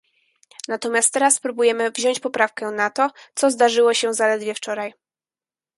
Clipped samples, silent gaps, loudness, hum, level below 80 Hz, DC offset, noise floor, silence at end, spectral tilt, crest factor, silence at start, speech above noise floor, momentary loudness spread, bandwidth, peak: under 0.1%; none; -20 LUFS; none; -74 dBFS; under 0.1%; under -90 dBFS; 0.85 s; -1 dB/octave; 20 dB; 0.7 s; over 70 dB; 11 LU; 12 kHz; -2 dBFS